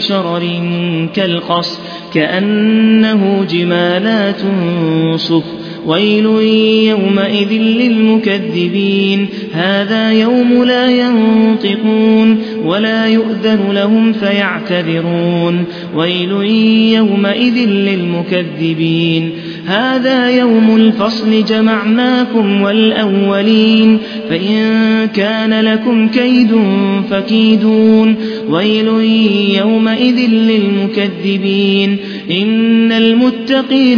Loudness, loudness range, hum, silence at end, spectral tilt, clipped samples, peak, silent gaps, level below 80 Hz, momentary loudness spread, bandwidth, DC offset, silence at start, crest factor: -11 LUFS; 2 LU; none; 0 s; -7.5 dB/octave; under 0.1%; 0 dBFS; none; -56 dBFS; 6 LU; 5.4 kHz; under 0.1%; 0 s; 10 dB